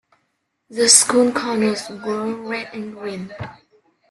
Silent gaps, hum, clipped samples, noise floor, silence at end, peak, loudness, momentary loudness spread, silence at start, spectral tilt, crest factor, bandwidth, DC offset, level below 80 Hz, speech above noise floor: none; none; under 0.1%; -71 dBFS; 0.6 s; 0 dBFS; -17 LUFS; 22 LU; 0.7 s; -2 dB/octave; 20 dB; 13 kHz; under 0.1%; -60 dBFS; 52 dB